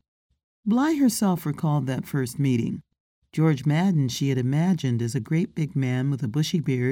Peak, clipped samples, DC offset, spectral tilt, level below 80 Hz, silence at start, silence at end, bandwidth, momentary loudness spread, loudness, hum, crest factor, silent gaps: -8 dBFS; under 0.1%; under 0.1%; -6.5 dB/octave; -62 dBFS; 0.65 s; 0 s; 17.5 kHz; 6 LU; -24 LUFS; none; 14 dB; 3.00-3.22 s